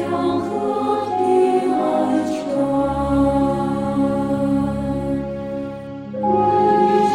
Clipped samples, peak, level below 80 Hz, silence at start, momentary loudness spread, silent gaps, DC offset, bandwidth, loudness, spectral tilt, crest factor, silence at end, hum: under 0.1%; -6 dBFS; -40 dBFS; 0 s; 10 LU; none; under 0.1%; 11 kHz; -19 LUFS; -7.5 dB/octave; 14 dB; 0 s; none